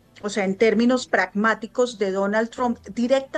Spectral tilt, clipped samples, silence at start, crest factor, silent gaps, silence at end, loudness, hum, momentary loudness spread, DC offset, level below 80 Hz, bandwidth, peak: -5 dB/octave; under 0.1%; 0.25 s; 16 dB; none; 0 s; -22 LUFS; none; 7 LU; under 0.1%; -60 dBFS; 9.6 kHz; -6 dBFS